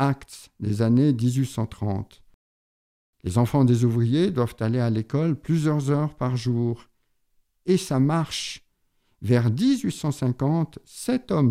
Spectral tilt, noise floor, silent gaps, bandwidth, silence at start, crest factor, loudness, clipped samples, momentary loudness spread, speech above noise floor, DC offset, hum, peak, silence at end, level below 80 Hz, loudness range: -7 dB/octave; -68 dBFS; 2.34-3.13 s; 14.5 kHz; 0 s; 18 dB; -24 LUFS; under 0.1%; 13 LU; 46 dB; under 0.1%; none; -6 dBFS; 0 s; -56 dBFS; 3 LU